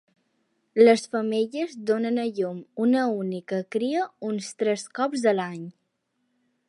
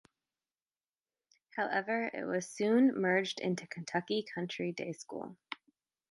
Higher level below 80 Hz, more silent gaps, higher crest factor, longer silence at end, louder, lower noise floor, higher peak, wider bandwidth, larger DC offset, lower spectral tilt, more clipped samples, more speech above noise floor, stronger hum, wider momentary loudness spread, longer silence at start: about the same, -80 dBFS vs -84 dBFS; neither; about the same, 22 dB vs 20 dB; first, 1 s vs 0.55 s; first, -25 LUFS vs -34 LUFS; second, -75 dBFS vs under -90 dBFS; first, -4 dBFS vs -16 dBFS; about the same, 11.5 kHz vs 11.5 kHz; neither; about the same, -5.5 dB/octave vs -5 dB/octave; neither; second, 51 dB vs over 56 dB; neither; second, 12 LU vs 17 LU; second, 0.75 s vs 1.55 s